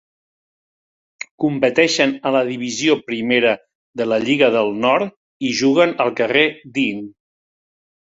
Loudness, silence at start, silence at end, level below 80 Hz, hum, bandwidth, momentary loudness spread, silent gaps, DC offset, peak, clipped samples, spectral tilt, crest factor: -17 LUFS; 1.4 s; 0.9 s; -64 dBFS; none; 8 kHz; 11 LU; 3.75-3.94 s, 5.16-5.40 s; under 0.1%; -2 dBFS; under 0.1%; -4 dB/octave; 18 dB